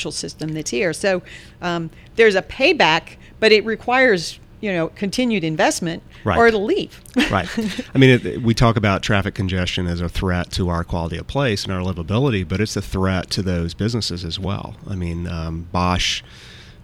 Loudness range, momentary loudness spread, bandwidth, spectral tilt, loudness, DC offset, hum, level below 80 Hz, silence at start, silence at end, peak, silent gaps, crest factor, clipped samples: 6 LU; 11 LU; 16 kHz; -5 dB/octave; -19 LUFS; under 0.1%; none; -38 dBFS; 0 s; 0.15 s; 0 dBFS; none; 20 dB; under 0.1%